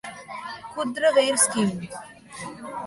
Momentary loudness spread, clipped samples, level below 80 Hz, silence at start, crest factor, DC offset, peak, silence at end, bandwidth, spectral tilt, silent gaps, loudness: 19 LU; under 0.1%; -62 dBFS; 0.05 s; 20 dB; under 0.1%; -6 dBFS; 0 s; 12 kHz; -3 dB/octave; none; -22 LUFS